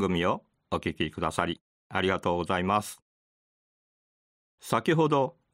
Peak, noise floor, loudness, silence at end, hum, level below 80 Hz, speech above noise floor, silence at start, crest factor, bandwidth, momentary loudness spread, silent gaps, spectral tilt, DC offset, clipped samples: -8 dBFS; under -90 dBFS; -28 LUFS; 0.25 s; none; -56 dBFS; over 62 dB; 0 s; 22 dB; 16 kHz; 12 LU; 1.61-1.90 s, 3.02-4.58 s; -5.5 dB/octave; under 0.1%; under 0.1%